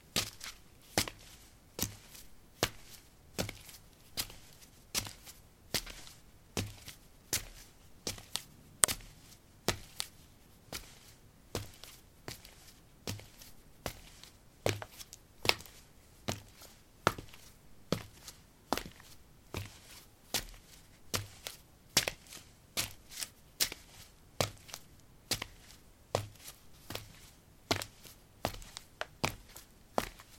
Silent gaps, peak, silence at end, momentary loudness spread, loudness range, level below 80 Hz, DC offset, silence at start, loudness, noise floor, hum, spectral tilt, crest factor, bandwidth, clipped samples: none; -2 dBFS; 0 s; 22 LU; 7 LU; -58 dBFS; under 0.1%; 0.05 s; -38 LUFS; -59 dBFS; none; -2 dB/octave; 40 dB; 16.5 kHz; under 0.1%